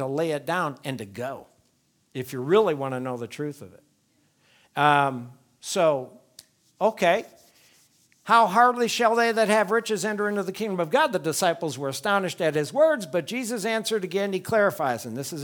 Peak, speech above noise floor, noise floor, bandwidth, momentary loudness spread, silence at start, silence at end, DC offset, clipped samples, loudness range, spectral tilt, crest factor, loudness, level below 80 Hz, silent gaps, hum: -4 dBFS; 43 dB; -67 dBFS; 19.5 kHz; 14 LU; 0 s; 0 s; under 0.1%; under 0.1%; 6 LU; -4 dB/octave; 20 dB; -24 LUFS; -74 dBFS; none; none